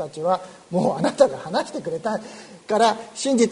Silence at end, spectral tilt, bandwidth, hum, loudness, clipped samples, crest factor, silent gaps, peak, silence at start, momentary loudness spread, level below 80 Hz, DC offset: 0 s; -4.5 dB/octave; 11 kHz; none; -23 LUFS; under 0.1%; 20 dB; none; -2 dBFS; 0 s; 10 LU; -64 dBFS; under 0.1%